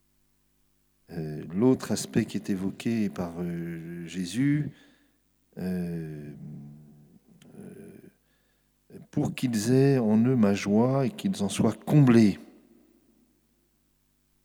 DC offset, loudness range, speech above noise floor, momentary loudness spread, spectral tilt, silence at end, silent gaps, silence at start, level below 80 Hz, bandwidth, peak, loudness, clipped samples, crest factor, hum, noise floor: under 0.1%; 16 LU; 44 dB; 21 LU; -7 dB/octave; 2 s; none; 1.1 s; -64 dBFS; 19 kHz; -8 dBFS; -26 LUFS; under 0.1%; 20 dB; 50 Hz at -55 dBFS; -69 dBFS